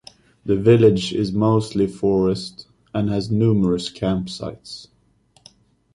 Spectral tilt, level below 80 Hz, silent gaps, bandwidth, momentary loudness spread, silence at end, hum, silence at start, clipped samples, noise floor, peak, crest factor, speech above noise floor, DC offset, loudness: -7.5 dB/octave; -46 dBFS; none; 11.5 kHz; 18 LU; 1.1 s; none; 0.45 s; under 0.1%; -59 dBFS; -2 dBFS; 18 dB; 40 dB; under 0.1%; -19 LUFS